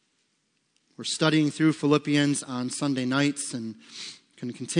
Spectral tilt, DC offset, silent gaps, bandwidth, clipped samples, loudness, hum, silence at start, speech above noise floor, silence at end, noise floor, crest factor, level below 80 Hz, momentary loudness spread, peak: -4.5 dB/octave; under 0.1%; none; 10.5 kHz; under 0.1%; -25 LUFS; none; 1 s; 47 dB; 0 s; -73 dBFS; 20 dB; -78 dBFS; 16 LU; -8 dBFS